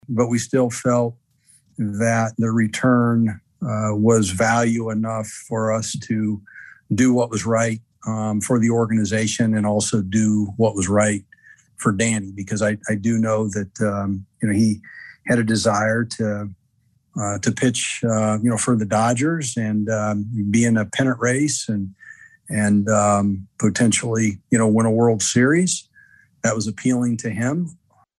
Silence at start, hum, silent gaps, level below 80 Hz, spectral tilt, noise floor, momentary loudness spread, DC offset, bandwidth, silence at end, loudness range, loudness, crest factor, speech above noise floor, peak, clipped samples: 0.1 s; none; none; -58 dBFS; -5 dB/octave; -63 dBFS; 9 LU; under 0.1%; 12.5 kHz; 0.45 s; 3 LU; -20 LUFS; 16 dB; 44 dB; -4 dBFS; under 0.1%